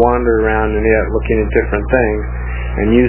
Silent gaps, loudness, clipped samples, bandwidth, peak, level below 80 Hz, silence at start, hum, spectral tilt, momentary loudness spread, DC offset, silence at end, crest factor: none; -15 LUFS; under 0.1%; 3.2 kHz; 0 dBFS; -20 dBFS; 0 s; 60 Hz at -20 dBFS; -11.5 dB/octave; 7 LU; under 0.1%; 0 s; 14 dB